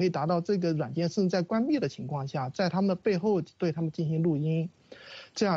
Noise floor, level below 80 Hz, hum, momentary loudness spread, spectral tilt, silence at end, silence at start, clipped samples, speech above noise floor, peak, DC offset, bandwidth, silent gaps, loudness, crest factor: -48 dBFS; -70 dBFS; none; 6 LU; -7 dB/octave; 0 s; 0 s; under 0.1%; 20 dB; -14 dBFS; under 0.1%; 7.6 kHz; none; -29 LUFS; 14 dB